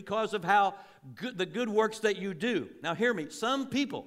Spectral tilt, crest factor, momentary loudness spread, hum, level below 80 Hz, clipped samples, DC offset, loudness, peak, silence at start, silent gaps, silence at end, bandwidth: -4.5 dB/octave; 18 dB; 11 LU; none; -76 dBFS; under 0.1%; under 0.1%; -30 LUFS; -12 dBFS; 0 s; none; 0 s; 15.5 kHz